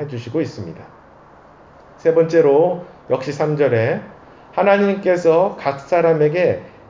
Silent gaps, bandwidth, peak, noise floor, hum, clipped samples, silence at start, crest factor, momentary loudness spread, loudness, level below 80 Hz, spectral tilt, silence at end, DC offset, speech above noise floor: none; 7.6 kHz; -2 dBFS; -45 dBFS; none; under 0.1%; 0 s; 16 dB; 12 LU; -17 LUFS; -56 dBFS; -7.5 dB/octave; 0.2 s; under 0.1%; 29 dB